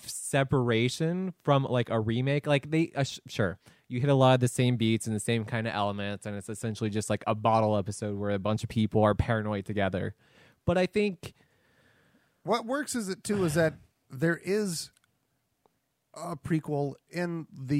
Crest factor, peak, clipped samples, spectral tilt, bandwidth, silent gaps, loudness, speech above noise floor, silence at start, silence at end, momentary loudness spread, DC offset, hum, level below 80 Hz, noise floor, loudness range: 20 dB; -8 dBFS; under 0.1%; -6 dB/octave; 16 kHz; none; -29 LUFS; 48 dB; 0 s; 0 s; 10 LU; under 0.1%; none; -56 dBFS; -76 dBFS; 5 LU